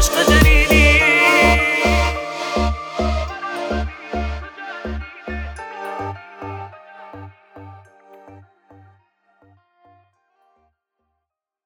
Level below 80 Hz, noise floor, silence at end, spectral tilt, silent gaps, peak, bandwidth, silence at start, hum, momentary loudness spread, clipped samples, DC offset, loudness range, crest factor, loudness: -24 dBFS; -80 dBFS; 3.25 s; -4 dB/octave; none; 0 dBFS; 19 kHz; 0 s; none; 21 LU; under 0.1%; under 0.1%; 21 LU; 20 dB; -16 LUFS